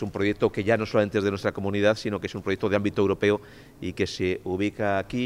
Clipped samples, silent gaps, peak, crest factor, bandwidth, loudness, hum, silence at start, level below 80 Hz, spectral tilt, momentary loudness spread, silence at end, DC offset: under 0.1%; none; -8 dBFS; 18 dB; 14.5 kHz; -26 LUFS; none; 0 s; -54 dBFS; -6.5 dB/octave; 6 LU; 0 s; under 0.1%